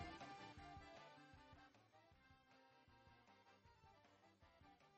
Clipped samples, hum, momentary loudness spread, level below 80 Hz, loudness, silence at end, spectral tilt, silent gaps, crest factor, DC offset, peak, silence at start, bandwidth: under 0.1%; none; 10 LU; -76 dBFS; -61 LUFS; 0 s; -5 dB/octave; none; 22 dB; under 0.1%; -42 dBFS; 0 s; 8.2 kHz